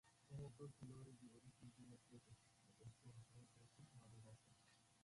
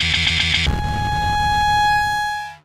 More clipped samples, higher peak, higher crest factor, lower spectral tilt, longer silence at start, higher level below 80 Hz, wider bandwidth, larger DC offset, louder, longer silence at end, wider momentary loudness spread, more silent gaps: neither; second, -46 dBFS vs -2 dBFS; about the same, 16 dB vs 16 dB; first, -6 dB/octave vs -3 dB/octave; about the same, 0.05 s vs 0 s; second, -82 dBFS vs -30 dBFS; second, 11.5 kHz vs 15.5 kHz; neither; second, -63 LUFS vs -18 LUFS; about the same, 0 s vs 0.05 s; first, 9 LU vs 6 LU; neither